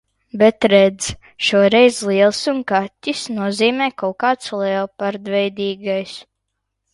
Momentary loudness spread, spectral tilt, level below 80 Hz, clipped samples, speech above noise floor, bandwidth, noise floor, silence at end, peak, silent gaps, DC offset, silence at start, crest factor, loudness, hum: 11 LU; -4 dB/octave; -54 dBFS; under 0.1%; 59 dB; 11.5 kHz; -76 dBFS; 0.7 s; 0 dBFS; none; under 0.1%; 0.35 s; 18 dB; -17 LUFS; none